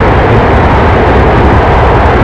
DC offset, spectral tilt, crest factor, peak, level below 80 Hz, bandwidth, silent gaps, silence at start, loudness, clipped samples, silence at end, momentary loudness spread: 2%; -8 dB/octave; 6 dB; 0 dBFS; -12 dBFS; 8 kHz; none; 0 s; -6 LUFS; 2%; 0 s; 0 LU